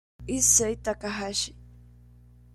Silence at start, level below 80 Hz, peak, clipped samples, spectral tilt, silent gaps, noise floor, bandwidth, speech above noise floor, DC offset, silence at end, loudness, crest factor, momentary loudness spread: 0.2 s; -48 dBFS; -8 dBFS; under 0.1%; -2 dB/octave; none; -53 dBFS; 15 kHz; 26 dB; under 0.1%; 0.85 s; -24 LUFS; 22 dB; 13 LU